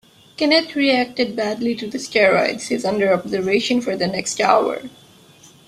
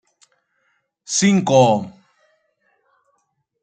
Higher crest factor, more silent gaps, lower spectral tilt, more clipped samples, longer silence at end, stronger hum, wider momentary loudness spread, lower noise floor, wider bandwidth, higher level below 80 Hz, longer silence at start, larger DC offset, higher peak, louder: about the same, 18 dB vs 20 dB; neither; about the same, -3.5 dB/octave vs -4.5 dB/octave; neither; second, 0.8 s vs 1.75 s; neither; about the same, 8 LU vs 9 LU; second, -48 dBFS vs -69 dBFS; first, 14.5 kHz vs 9.4 kHz; about the same, -60 dBFS vs -64 dBFS; second, 0.4 s vs 1.1 s; neither; about the same, -2 dBFS vs -2 dBFS; second, -19 LUFS vs -16 LUFS